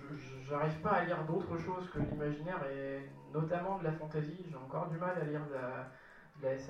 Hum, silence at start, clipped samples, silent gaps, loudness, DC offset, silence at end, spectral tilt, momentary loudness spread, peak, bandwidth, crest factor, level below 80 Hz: none; 0 s; under 0.1%; none; -39 LUFS; under 0.1%; 0 s; -8 dB/octave; 13 LU; -20 dBFS; 7.2 kHz; 18 dB; -62 dBFS